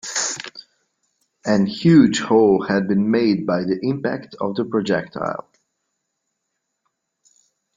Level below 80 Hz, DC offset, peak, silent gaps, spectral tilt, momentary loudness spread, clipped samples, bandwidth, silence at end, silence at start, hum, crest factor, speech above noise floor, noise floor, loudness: -58 dBFS; under 0.1%; -2 dBFS; none; -5.5 dB/octave; 13 LU; under 0.1%; 9.6 kHz; 2.35 s; 0.05 s; none; 18 dB; 59 dB; -77 dBFS; -19 LUFS